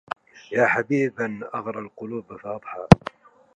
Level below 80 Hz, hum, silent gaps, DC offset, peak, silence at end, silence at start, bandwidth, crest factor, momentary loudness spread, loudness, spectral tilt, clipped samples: -44 dBFS; none; none; under 0.1%; 0 dBFS; 0.6 s; 0.5 s; 11 kHz; 24 dB; 18 LU; -21 LUFS; -7.5 dB/octave; under 0.1%